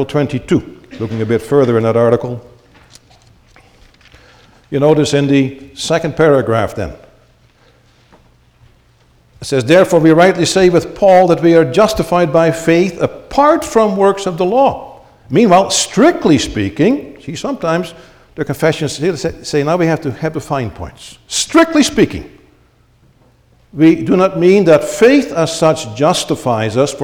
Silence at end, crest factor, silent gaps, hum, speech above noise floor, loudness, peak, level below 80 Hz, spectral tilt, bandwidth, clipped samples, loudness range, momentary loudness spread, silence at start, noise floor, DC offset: 0 s; 14 dB; none; none; 38 dB; -12 LUFS; 0 dBFS; -42 dBFS; -5.5 dB/octave; 17.5 kHz; under 0.1%; 7 LU; 13 LU; 0 s; -51 dBFS; under 0.1%